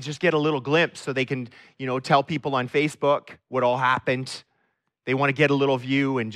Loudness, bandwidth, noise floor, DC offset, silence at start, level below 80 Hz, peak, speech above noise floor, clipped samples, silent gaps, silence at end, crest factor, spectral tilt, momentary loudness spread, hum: -23 LUFS; 12.5 kHz; -73 dBFS; under 0.1%; 0 s; -68 dBFS; -6 dBFS; 49 dB; under 0.1%; none; 0 s; 18 dB; -6 dB/octave; 11 LU; none